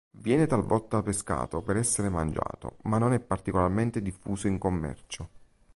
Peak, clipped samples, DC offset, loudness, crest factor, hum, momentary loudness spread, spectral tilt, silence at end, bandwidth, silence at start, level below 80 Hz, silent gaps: -10 dBFS; under 0.1%; under 0.1%; -28 LUFS; 18 dB; none; 11 LU; -6 dB/octave; 0.3 s; 11.5 kHz; 0.15 s; -46 dBFS; none